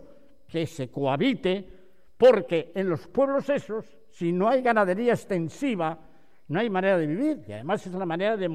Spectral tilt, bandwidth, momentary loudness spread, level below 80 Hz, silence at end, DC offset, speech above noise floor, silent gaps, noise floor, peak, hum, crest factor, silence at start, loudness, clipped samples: -7 dB/octave; 12.5 kHz; 11 LU; -62 dBFS; 0 s; 0.4%; 30 dB; none; -55 dBFS; -8 dBFS; none; 18 dB; 0.55 s; -26 LUFS; under 0.1%